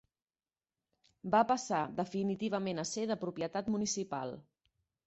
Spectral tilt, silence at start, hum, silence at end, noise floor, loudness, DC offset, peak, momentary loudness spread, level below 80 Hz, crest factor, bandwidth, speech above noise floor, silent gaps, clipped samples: -5 dB/octave; 1.25 s; none; 0.65 s; under -90 dBFS; -35 LUFS; under 0.1%; -16 dBFS; 10 LU; -72 dBFS; 20 dB; 8 kHz; over 56 dB; none; under 0.1%